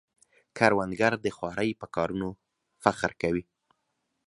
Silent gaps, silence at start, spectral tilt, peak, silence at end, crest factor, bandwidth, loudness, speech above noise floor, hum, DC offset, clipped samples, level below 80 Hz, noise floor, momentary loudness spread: none; 0.55 s; -5.5 dB/octave; -2 dBFS; 0.85 s; 28 dB; 11.5 kHz; -28 LUFS; 51 dB; none; under 0.1%; under 0.1%; -58 dBFS; -79 dBFS; 10 LU